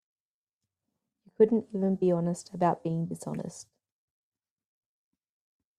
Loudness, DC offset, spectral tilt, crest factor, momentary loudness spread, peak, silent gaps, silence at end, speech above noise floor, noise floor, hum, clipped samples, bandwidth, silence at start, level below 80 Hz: -29 LUFS; under 0.1%; -8 dB/octave; 22 dB; 13 LU; -10 dBFS; none; 2.15 s; over 62 dB; under -90 dBFS; none; under 0.1%; 12.5 kHz; 1.4 s; -72 dBFS